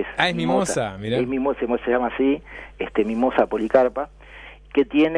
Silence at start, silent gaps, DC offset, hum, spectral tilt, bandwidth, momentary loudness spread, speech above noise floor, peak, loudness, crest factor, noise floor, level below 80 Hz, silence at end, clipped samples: 0 s; none; under 0.1%; none; -5 dB/octave; 11 kHz; 13 LU; 22 dB; 0 dBFS; -22 LUFS; 20 dB; -43 dBFS; -46 dBFS; 0 s; under 0.1%